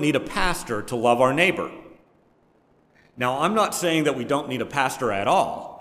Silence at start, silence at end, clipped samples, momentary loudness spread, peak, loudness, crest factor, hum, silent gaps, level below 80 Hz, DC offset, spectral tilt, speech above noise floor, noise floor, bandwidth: 0 s; 0.05 s; under 0.1%; 9 LU; -4 dBFS; -23 LUFS; 20 dB; none; none; -44 dBFS; under 0.1%; -4.5 dB/octave; 38 dB; -61 dBFS; 16 kHz